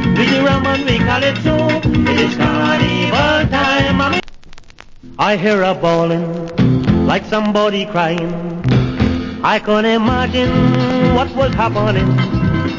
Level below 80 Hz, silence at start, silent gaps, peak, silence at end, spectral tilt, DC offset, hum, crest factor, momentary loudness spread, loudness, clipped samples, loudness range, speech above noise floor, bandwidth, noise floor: -30 dBFS; 0 s; none; 0 dBFS; 0 s; -6.5 dB/octave; under 0.1%; none; 14 dB; 4 LU; -14 LUFS; under 0.1%; 2 LU; 22 dB; 7.6 kHz; -36 dBFS